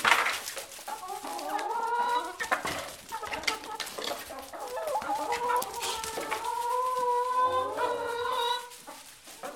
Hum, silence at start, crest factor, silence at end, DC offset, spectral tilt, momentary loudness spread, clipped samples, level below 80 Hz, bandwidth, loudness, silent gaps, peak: none; 0 s; 26 dB; 0 s; under 0.1%; -1 dB/octave; 12 LU; under 0.1%; -64 dBFS; 17 kHz; -31 LUFS; none; -6 dBFS